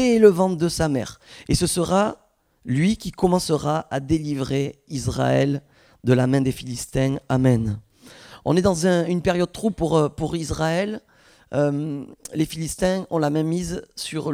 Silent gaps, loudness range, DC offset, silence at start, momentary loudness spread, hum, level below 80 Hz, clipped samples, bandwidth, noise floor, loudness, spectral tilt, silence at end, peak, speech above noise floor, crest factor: none; 3 LU; under 0.1%; 0 s; 11 LU; none; -44 dBFS; under 0.1%; 16 kHz; -46 dBFS; -22 LUFS; -6 dB/octave; 0 s; 0 dBFS; 25 dB; 20 dB